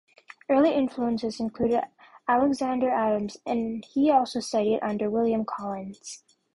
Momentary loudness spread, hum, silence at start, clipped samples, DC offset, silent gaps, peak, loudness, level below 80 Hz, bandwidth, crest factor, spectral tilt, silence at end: 14 LU; none; 0.5 s; under 0.1%; under 0.1%; none; -10 dBFS; -26 LUFS; -62 dBFS; 11.5 kHz; 16 dB; -5.5 dB/octave; 0.35 s